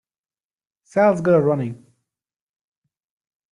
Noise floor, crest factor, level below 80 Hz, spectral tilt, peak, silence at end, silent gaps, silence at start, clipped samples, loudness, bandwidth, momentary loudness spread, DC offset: under -90 dBFS; 18 dB; -64 dBFS; -8.5 dB/octave; -4 dBFS; 1.8 s; none; 0.95 s; under 0.1%; -18 LUFS; 11 kHz; 9 LU; under 0.1%